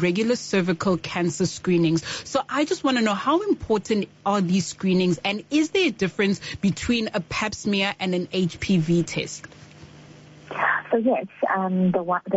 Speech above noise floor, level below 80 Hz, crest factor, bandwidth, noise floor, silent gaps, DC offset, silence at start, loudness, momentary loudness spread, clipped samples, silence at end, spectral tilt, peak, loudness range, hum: 23 dB; -52 dBFS; 14 dB; 8 kHz; -46 dBFS; none; under 0.1%; 0 s; -23 LUFS; 5 LU; under 0.1%; 0 s; -4.5 dB/octave; -8 dBFS; 3 LU; none